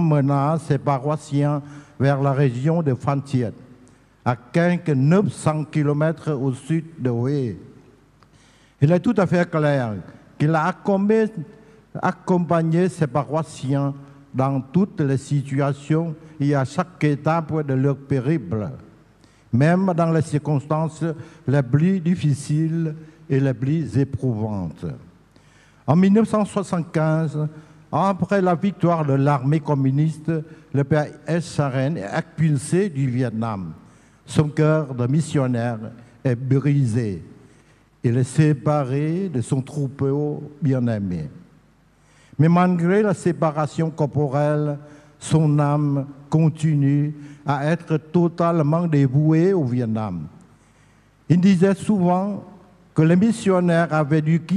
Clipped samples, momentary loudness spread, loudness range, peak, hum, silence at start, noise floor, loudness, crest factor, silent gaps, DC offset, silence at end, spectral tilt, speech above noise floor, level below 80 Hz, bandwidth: under 0.1%; 10 LU; 3 LU; -4 dBFS; none; 0 s; -56 dBFS; -21 LUFS; 18 dB; none; under 0.1%; 0 s; -8 dB/octave; 36 dB; -58 dBFS; 11 kHz